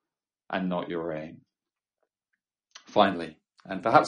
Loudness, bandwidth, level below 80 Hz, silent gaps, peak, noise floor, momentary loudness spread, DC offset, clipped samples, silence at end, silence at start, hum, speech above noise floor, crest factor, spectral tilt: -29 LUFS; 10 kHz; -70 dBFS; none; -4 dBFS; under -90 dBFS; 15 LU; under 0.1%; under 0.1%; 0 s; 0.5 s; none; over 64 dB; 26 dB; -6 dB/octave